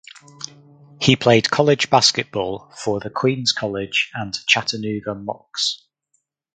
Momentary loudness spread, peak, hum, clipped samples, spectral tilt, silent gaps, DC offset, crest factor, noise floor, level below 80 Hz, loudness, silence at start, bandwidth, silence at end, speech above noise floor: 15 LU; 0 dBFS; none; under 0.1%; -3.5 dB/octave; none; under 0.1%; 20 dB; -70 dBFS; -56 dBFS; -19 LUFS; 0.15 s; 9.6 kHz; 0.8 s; 50 dB